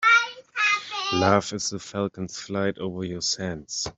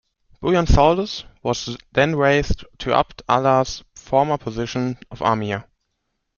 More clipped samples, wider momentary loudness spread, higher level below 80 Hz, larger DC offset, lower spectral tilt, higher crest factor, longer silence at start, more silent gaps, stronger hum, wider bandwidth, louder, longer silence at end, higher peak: neither; about the same, 10 LU vs 11 LU; second, -58 dBFS vs -32 dBFS; neither; second, -3 dB/octave vs -5.5 dB/octave; about the same, 22 dB vs 20 dB; second, 0 s vs 0.4 s; neither; neither; first, 8.2 kHz vs 7.2 kHz; second, -25 LUFS vs -20 LUFS; second, 0.05 s vs 0.75 s; about the same, -4 dBFS vs -2 dBFS